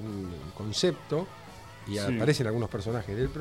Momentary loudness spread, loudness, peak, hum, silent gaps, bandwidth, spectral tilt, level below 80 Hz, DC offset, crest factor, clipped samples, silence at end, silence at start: 15 LU; -31 LUFS; -10 dBFS; none; none; 16 kHz; -5.5 dB/octave; -50 dBFS; 0.1%; 20 dB; under 0.1%; 0 s; 0 s